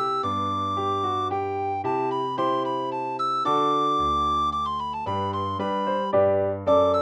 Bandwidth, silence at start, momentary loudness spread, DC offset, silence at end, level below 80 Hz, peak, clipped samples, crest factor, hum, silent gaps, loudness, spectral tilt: 9.8 kHz; 0 s; 6 LU; under 0.1%; 0 s; -50 dBFS; -8 dBFS; under 0.1%; 16 dB; none; none; -24 LUFS; -6.5 dB/octave